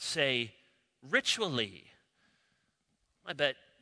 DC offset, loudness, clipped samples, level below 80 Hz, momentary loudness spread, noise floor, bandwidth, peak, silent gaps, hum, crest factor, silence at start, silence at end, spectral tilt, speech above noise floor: under 0.1%; -32 LUFS; under 0.1%; -78 dBFS; 12 LU; -78 dBFS; 11 kHz; -12 dBFS; none; none; 24 dB; 0 s; 0.3 s; -2.5 dB/octave; 45 dB